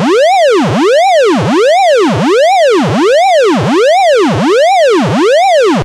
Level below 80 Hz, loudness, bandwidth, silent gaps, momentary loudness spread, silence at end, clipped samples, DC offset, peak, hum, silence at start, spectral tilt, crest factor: -44 dBFS; -8 LUFS; 13.5 kHz; none; 2 LU; 0 s; under 0.1%; under 0.1%; -2 dBFS; none; 0 s; -5 dB/octave; 6 dB